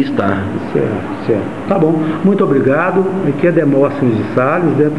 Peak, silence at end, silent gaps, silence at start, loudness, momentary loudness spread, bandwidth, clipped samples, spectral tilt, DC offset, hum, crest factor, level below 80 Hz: 0 dBFS; 0 s; none; 0 s; -14 LUFS; 6 LU; 10.5 kHz; under 0.1%; -9 dB/octave; 2%; none; 12 dB; -50 dBFS